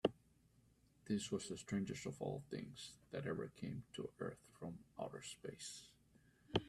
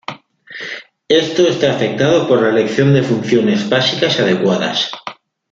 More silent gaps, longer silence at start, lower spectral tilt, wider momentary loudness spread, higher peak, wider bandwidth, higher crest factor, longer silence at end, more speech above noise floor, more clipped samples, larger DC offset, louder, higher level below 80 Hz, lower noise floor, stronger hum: neither; about the same, 0.05 s vs 0.1 s; about the same, -5 dB/octave vs -5.5 dB/octave; second, 10 LU vs 16 LU; second, -20 dBFS vs -2 dBFS; first, 13 kHz vs 7.8 kHz; first, 28 dB vs 14 dB; second, 0 s vs 0.4 s; first, 26 dB vs 21 dB; neither; neither; second, -48 LUFS vs -14 LUFS; second, -74 dBFS vs -56 dBFS; first, -73 dBFS vs -34 dBFS; neither